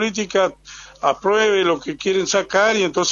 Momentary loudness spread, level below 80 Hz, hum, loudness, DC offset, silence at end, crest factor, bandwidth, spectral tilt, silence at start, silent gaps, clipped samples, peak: 7 LU; -54 dBFS; none; -18 LUFS; under 0.1%; 0 s; 16 dB; 7.6 kHz; -3 dB/octave; 0 s; none; under 0.1%; -2 dBFS